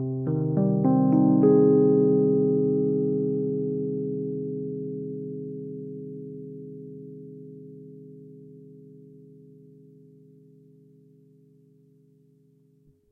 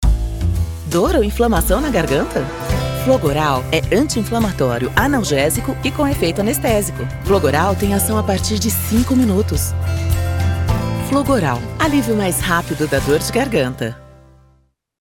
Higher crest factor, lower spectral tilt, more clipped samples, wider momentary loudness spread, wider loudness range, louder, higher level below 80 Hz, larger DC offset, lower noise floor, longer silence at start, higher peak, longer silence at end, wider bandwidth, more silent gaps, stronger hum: about the same, 18 dB vs 16 dB; first, -15 dB/octave vs -5 dB/octave; neither; first, 25 LU vs 5 LU; first, 24 LU vs 1 LU; second, -24 LUFS vs -17 LUFS; second, -70 dBFS vs -28 dBFS; neither; first, -61 dBFS vs -57 dBFS; about the same, 0 s vs 0 s; second, -8 dBFS vs -2 dBFS; first, 4 s vs 1.05 s; second, 1.8 kHz vs 17.5 kHz; neither; neither